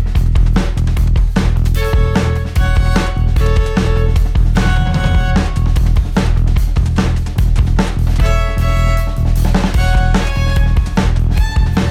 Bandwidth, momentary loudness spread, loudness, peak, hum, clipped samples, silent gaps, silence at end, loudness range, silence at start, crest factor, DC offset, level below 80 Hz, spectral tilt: 14 kHz; 2 LU; -15 LUFS; -2 dBFS; none; under 0.1%; none; 0 s; 1 LU; 0 s; 10 dB; under 0.1%; -14 dBFS; -6.5 dB/octave